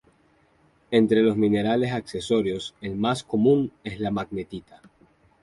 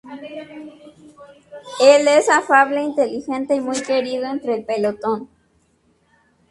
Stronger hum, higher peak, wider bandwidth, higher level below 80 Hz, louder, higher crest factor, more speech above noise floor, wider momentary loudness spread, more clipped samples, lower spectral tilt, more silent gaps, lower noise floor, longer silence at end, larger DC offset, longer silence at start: neither; second, -6 dBFS vs 0 dBFS; about the same, 11.5 kHz vs 11.5 kHz; first, -56 dBFS vs -64 dBFS; second, -24 LUFS vs -17 LUFS; about the same, 18 dB vs 20 dB; second, 38 dB vs 44 dB; second, 12 LU vs 21 LU; neither; first, -6.5 dB/octave vs -3 dB/octave; neither; about the same, -62 dBFS vs -61 dBFS; second, 0.8 s vs 1.25 s; neither; first, 0.9 s vs 0.05 s